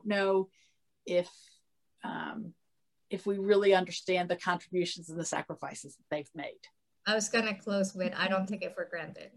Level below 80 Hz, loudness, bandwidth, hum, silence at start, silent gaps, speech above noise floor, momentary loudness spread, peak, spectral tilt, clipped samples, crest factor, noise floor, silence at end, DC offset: -82 dBFS; -32 LUFS; 12 kHz; none; 0.05 s; none; 52 dB; 15 LU; -12 dBFS; -4 dB/octave; under 0.1%; 20 dB; -84 dBFS; 0.1 s; under 0.1%